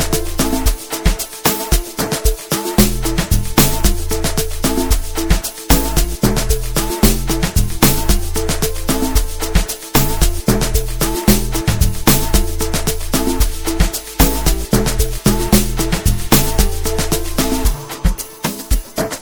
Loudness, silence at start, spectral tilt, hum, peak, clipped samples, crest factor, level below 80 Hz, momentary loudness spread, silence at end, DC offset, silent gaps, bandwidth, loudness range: -17 LUFS; 0 s; -4 dB/octave; none; 0 dBFS; under 0.1%; 16 dB; -18 dBFS; 6 LU; 0 s; 5%; none; 20 kHz; 2 LU